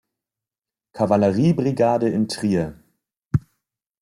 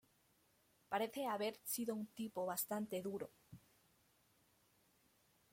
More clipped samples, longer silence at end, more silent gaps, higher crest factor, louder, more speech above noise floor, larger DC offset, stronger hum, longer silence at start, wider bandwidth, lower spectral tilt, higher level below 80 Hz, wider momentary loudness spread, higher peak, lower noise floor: neither; second, 0.6 s vs 1.95 s; neither; about the same, 18 dB vs 22 dB; first, -21 LUFS vs -43 LUFS; first, over 71 dB vs 33 dB; neither; neither; about the same, 0.95 s vs 0.9 s; second, 12.5 kHz vs 16.5 kHz; first, -7.5 dB/octave vs -4 dB/octave; first, -52 dBFS vs -86 dBFS; about the same, 8 LU vs 6 LU; first, -4 dBFS vs -26 dBFS; first, under -90 dBFS vs -76 dBFS